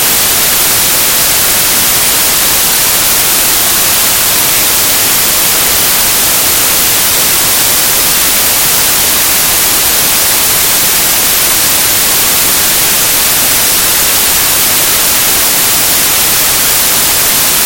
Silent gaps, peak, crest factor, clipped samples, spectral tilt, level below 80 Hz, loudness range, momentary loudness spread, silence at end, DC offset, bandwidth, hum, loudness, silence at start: none; 0 dBFS; 8 dB; 0.6%; 0 dB/octave; -34 dBFS; 0 LU; 0 LU; 0 s; under 0.1%; over 20 kHz; none; -5 LUFS; 0 s